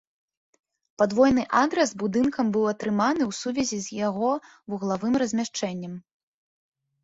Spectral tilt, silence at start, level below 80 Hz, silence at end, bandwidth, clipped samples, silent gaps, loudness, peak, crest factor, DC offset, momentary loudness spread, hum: -5 dB/octave; 1 s; -58 dBFS; 1.05 s; 8 kHz; under 0.1%; none; -25 LUFS; -6 dBFS; 18 dB; under 0.1%; 11 LU; none